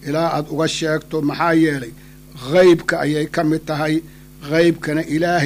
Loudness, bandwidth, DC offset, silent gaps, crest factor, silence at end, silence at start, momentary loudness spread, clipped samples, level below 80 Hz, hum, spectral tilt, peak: -18 LUFS; 15.5 kHz; under 0.1%; none; 16 dB; 0 s; 0 s; 9 LU; under 0.1%; -48 dBFS; none; -5.5 dB/octave; -2 dBFS